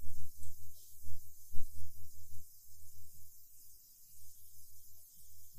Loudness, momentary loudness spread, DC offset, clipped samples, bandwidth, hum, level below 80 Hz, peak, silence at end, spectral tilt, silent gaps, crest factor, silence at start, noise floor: -56 LUFS; 5 LU; under 0.1%; under 0.1%; 15.5 kHz; none; -50 dBFS; -16 dBFS; 0 s; -4 dB/octave; none; 16 dB; 0 s; -56 dBFS